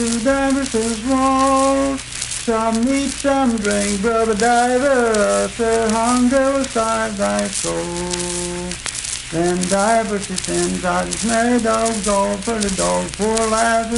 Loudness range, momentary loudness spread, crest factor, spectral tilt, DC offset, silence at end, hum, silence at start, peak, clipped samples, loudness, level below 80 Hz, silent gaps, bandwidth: 4 LU; 7 LU; 16 dB; -3.5 dB/octave; under 0.1%; 0 s; none; 0 s; 0 dBFS; under 0.1%; -18 LUFS; -38 dBFS; none; 11.5 kHz